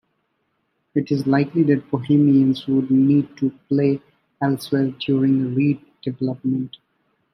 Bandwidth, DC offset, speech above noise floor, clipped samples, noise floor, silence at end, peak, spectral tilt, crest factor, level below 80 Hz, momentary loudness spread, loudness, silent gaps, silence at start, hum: 13 kHz; under 0.1%; 52 dB; under 0.1%; -71 dBFS; 0.65 s; -4 dBFS; -8.5 dB/octave; 16 dB; -64 dBFS; 10 LU; -20 LUFS; none; 0.95 s; none